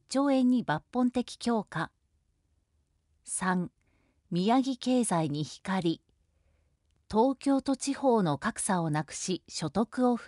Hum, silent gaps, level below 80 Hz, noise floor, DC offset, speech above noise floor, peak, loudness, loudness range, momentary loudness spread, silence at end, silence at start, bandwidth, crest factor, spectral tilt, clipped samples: none; none; -64 dBFS; -74 dBFS; under 0.1%; 45 dB; -14 dBFS; -30 LUFS; 4 LU; 8 LU; 0 s; 0.1 s; 11.5 kHz; 16 dB; -5 dB/octave; under 0.1%